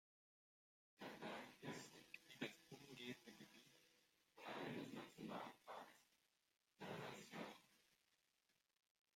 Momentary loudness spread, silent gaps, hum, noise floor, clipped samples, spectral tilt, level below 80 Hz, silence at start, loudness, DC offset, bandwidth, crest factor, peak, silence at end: 10 LU; none; none; -87 dBFS; under 0.1%; -4.5 dB/octave; under -90 dBFS; 1 s; -56 LUFS; under 0.1%; 16 kHz; 24 dB; -34 dBFS; 1.2 s